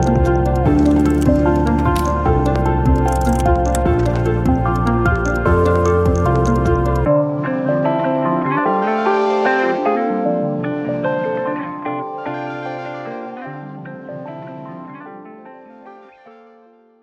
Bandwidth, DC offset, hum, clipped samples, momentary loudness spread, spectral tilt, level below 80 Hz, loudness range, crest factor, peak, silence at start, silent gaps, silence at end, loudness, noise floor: 14.5 kHz; under 0.1%; none; under 0.1%; 16 LU; -7.5 dB/octave; -26 dBFS; 15 LU; 14 dB; -2 dBFS; 0 s; none; 0.75 s; -17 LUFS; -49 dBFS